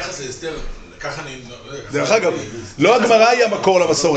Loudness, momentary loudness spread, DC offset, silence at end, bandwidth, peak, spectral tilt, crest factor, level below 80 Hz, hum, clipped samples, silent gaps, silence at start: -16 LUFS; 20 LU; under 0.1%; 0 s; 9 kHz; -2 dBFS; -3.5 dB/octave; 16 dB; -40 dBFS; none; under 0.1%; none; 0 s